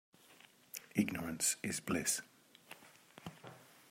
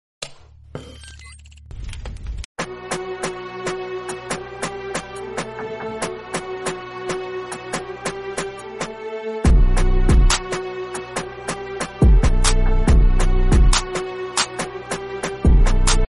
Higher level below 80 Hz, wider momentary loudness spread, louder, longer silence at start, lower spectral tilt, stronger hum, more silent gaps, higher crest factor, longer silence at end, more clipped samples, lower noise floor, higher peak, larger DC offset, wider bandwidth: second, -74 dBFS vs -20 dBFS; first, 21 LU vs 17 LU; second, -37 LUFS vs -22 LUFS; about the same, 0.3 s vs 0.2 s; second, -3 dB/octave vs -4.5 dB/octave; neither; second, none vs 2.45-2.55 s; first, 22 dB vs 16 dB; first, 0.25 s vs 0.05 s; neither; first, -64 dBFS vs -42 dBFS; second, -20 dBFS vs -4 dBFS; neither; first, 16 kHz vs 11.5 kHz